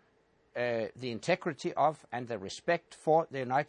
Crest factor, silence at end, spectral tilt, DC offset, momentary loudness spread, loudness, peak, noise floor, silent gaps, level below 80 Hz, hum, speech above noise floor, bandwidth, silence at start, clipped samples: 18 dB; 0.05 s; -5.5 dB/octave; under 0.1%; 10 LU; -33 LUFS; -14 dBFS; -69 dBFS; none; -76 dBFS; none; 37 dB; 10.5 kHz; 0.55 s; under 0.1%